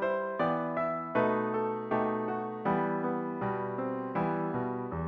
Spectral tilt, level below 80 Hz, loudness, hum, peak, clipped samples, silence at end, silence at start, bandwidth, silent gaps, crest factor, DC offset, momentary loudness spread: -9.5 dB/octave; -62 dBFS; -32 LUFS; none; -14 dBFS; under 0.1%; 0 s; 0 s; 5.8 kHz; none; 16 dB; under 0.1%; 5 LU